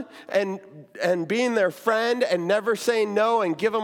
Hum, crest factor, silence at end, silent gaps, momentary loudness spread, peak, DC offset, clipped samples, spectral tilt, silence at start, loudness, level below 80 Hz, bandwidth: none; 16 dB; 0 s; none; 5 LU; -8 dBFS; under 0.1%; under 0.1%; -4.5 dB/octave; 0 s; -23 LUFS; -76 dBFS; 17.5 kHz